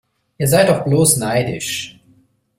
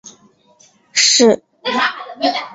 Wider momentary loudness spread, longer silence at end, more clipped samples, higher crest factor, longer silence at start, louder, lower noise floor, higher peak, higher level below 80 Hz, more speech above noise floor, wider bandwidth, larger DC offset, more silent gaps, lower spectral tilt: about the same, 11 LU vs 10 LU; first, 0.7 s vs 0 s; neither; about the same, 18 dB vs 16 dB; first, 0.4 s vs 0.05 s; about the same, -16 LUFS vs -14 LUFS; about the same, -55 dBFS vs -52 dBFS; about the same, 0 dBFS vs 0 dBFS; first, -48 dBFS vs -66 dBFS; first, 40 dB vs 36 dB; first, 16 kHz vs 8 kHz; neither; neither; first, -4.5 dB/octave vs -1 dB/octave